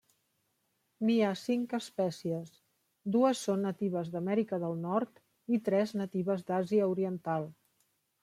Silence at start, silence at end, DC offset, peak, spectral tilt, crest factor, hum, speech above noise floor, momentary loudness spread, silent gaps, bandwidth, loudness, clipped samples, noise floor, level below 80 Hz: 1 s; 0.7 s; under 0.1%; -16 dBFS; -6.5 dB/octave; 18 dB; none; 47 dB; 9 LU; none; 14.5 kHz; -32 LUFS; under 0.1%; -78 dBFS; -80 dBFS